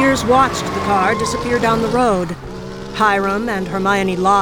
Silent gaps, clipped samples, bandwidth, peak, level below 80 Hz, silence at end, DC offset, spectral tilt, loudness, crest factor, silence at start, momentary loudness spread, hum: none; under 0.1%; 19.5 kHz; -2 dBFS; -38 dBFS; 0 s; under 0.1%; -5 dB/octave; -16 LUFS; 14 dB; 0 s; 12 LU; none